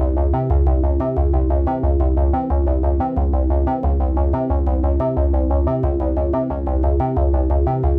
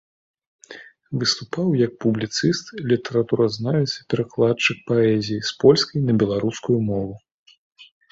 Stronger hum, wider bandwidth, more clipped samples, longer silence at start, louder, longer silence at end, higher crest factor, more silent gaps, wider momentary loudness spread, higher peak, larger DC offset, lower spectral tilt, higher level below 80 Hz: neither; second, 2.5 kHz vs 8 kHz; neither; second, 0 s vs 0.7 s; about the same, -19 LUFS vs -21 LUFS; second, 0 s vs 0.3 s; second, 10 dB vs 20 dB; second, none vs 7.32-7.46 s, 7.58-7.71 s; second, 2 LU vs 9 LU; second, -6 dBFS vs -2 dBFS; neither; first, -12.5 dB/octave vs -5.5 dB/octave; first, -18 dBFS vs -56 dBFS